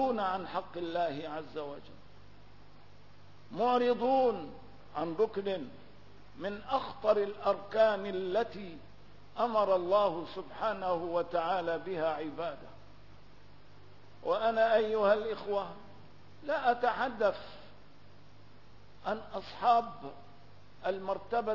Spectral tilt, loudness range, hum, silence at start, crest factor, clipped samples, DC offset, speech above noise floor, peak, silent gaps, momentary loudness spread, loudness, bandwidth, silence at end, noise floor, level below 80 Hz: -3 dB/octave; 5 LU; 50 Hz at -60 dBFS; 0 s; 20 dB; under 0.1%; 0.3%; 26 dB; -14 dBFS; none; 17 LU; -32 LUFS; 6 kHz; 0 s; -58 dBFS; -64 dBFS